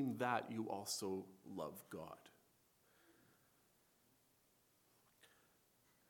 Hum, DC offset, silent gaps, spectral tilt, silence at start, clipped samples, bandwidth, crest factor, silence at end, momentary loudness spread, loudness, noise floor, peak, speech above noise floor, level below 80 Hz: none; under 0.1%; none; -4 dB/octave; 0 s; under 0.1%; 19 kHz; 26 dB; 0.85 s; 13 LU; -45 LUFS; -77 dBFS; -24 dBFS; 31 dB; -86 dBFS